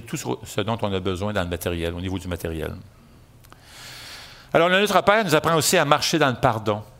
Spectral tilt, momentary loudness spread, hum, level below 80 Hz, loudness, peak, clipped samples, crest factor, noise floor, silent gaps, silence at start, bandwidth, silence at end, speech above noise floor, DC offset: -4 dB/octave; 20 LU; none; -50 dBFS; -21 LUFS; 0 dBFS; under 0.1%; 22 dB; -50 dBFS; none; 0 s; 16 kHz; 0.15 s; 28 dB; under 0.1%